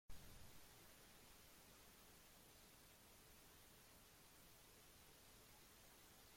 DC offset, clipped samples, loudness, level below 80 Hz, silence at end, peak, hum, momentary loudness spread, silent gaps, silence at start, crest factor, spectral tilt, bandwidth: under 0.1%; under 0.1%; -66 LUFS; -74 dBFS; 0 s; -44 dBFS; none; 2 LU; none; 0.1 s; 20 dB; -2.5 dB/octave; 16.5 kHz